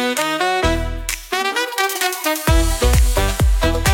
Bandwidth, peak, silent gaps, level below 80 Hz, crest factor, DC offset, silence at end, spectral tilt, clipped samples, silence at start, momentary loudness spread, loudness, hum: 17.5 kHz; -2 dBFS; none; -20 dBFS; 14 dB; under 0.1%; 0 s; -4 dB/octave; under 0.1%; 0 s; 5 LU; -18 LUFS; none